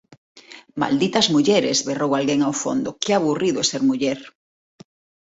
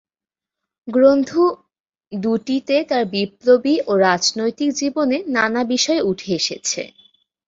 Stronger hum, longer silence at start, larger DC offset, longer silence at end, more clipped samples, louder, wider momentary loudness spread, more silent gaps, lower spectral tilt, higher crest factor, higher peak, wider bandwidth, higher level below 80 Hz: neither; second, 0.35 s vs 0.85 s; neither; first, 0.9 s vs 0.6 s; neither; about the same, -20 LUFS vs -18 LUFS; about the same, 7 LU vs 8 LU; second, none vs 1.80-1.84 s; about the same, -4 dB/octave vs -3.5 dB/octave; about the same, 18 dB vs 16 dB; about the same, -4 dBFS vs -2 dBFS; about the same, 8 kHz vs 7.8 kHz; about the same, -62 dBFS vs -62 dBFS